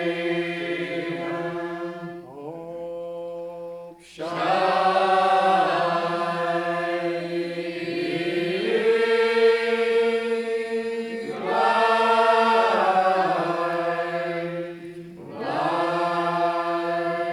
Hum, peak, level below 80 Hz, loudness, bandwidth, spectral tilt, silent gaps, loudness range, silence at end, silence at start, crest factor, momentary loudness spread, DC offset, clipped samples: none; -8 dBFS; -68 dBFS; -23 LUFS; 12 kHz; -5.5 dB/octave; none; 9 LU; 0 s; 0 s; 16 dB; 16 LU; under 0.1%; under 0.1%